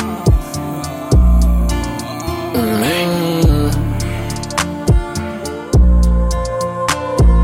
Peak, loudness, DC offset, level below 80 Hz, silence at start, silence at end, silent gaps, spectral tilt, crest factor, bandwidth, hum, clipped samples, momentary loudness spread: 0 dBFS; -16 LUFS; under 0.1%; -16 dBFS; 0 s; 0 s; none; -6 dB/octave; 14 dB; 16.5 kHz; none; under 0.1%; 10 LU